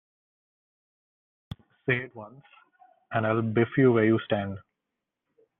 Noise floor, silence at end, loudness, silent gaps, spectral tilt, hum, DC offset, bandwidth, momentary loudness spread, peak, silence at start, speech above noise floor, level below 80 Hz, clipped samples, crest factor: -85 dBFS; 1 s; -26 LUFS; none; -6 dB/octave; none; under 0.1%; 3.9 kHz; 24 LU; -10 dBFS; 1.85 s; 60 dB; -64 dBFS; under 0.1%; 20 dB